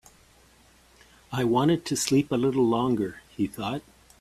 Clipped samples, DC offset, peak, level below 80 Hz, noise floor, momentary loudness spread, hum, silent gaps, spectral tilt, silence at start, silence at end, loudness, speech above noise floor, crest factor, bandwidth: under 0.1%; under 0.1%; -10 dBFS; -58 dBFS; -58 dBFS; 10 LU; none; none; -5.5 dB/octave; 1.3 s; 0.4 s; -26 LUFS; 33 dB; 18 dB; 15.5 kHz